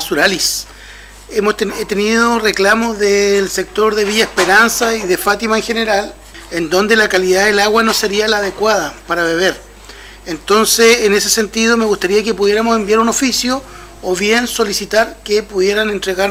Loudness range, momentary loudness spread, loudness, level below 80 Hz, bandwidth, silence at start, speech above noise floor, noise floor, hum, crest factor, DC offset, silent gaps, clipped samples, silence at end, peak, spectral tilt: 2 LU; 8 LU; -13 LUFS; -40 dBFS; 16.5 kHz; 0 s; 22 dB; -35 dBFS; none; 12 dB; under 0.1%; none; under 0.1%; 0 s; 0 dBFS; -2.5 dB/octave